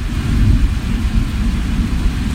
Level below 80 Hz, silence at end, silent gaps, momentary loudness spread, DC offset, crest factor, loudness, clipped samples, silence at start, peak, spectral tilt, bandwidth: -16 dBFS; 0 s; none; 4 LU; under 0.1%; 14 dB; -18 LUFS; under 0.1%; 0 s; -2 dBFS; -6.5 dB/octave; 15 kHz